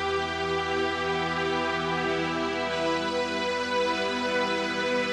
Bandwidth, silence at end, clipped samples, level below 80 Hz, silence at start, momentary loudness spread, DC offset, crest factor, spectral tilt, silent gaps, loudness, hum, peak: 12 kHz; 0 s; under 0.1%; -54 dBFS; 0 s; 2 LU; under 0.1%; 12 dB; -4 dB/octave; none; -27 LUFS; none; -14 dBFS